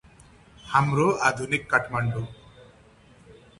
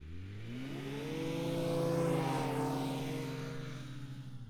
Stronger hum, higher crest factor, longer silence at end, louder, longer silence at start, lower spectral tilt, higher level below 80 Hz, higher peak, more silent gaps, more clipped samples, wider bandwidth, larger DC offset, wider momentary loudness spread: neither; first, 22 dB vs 16 dB; first, 0.3 s vs 0 s; first, -24 LUFS vs -38 LUFS; first, 0.65 s vs 0 s; about the same, -5.5 dB/octave vs -6.5 dB/octave; first, -54 dBFS vs -62 dBFS; first, -4 dBFS vs -22 dBFS; neither; neither; second, 11.5 kHz vs 19 kHz; neither; second, 9 LU vs 13 LU